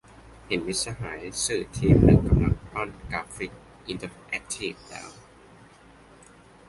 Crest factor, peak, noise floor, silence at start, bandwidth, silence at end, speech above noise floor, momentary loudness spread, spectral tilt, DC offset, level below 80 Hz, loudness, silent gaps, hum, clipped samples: 22 dB; -4 dBFS; -52 dBFS; 0.5 s; 11.5 kHz; 1.55 s; 27 dB; 19 LU; -5.5 dB/octave; under 0.1%; -36 dBFS; -26 LUFS; none; none; under 0.1%